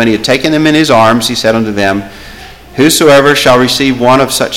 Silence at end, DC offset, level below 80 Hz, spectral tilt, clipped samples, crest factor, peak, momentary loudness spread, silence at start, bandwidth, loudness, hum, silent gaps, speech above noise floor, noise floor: 0 s; 0.9%; -38 dBFS; -4 dB/octave; 0.1%; 8 dB; 0 dBFS; 8 LU; 0 s; 17 kHz; -8 LUFS; none; none; 22 dB; -30 dBFS